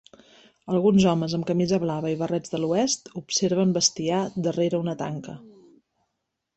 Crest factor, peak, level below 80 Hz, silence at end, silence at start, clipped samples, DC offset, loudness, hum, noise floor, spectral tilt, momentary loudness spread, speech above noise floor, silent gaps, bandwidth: 20 dB; -6 dBFS; -60 dBFS; 1.1 s; 0.65 s; under 0.1%; under 0.1%; -24 LUFS; none; -80 dBFS; -5 dB/octave; 9 LU; 56 dB; none; 8.4 kHz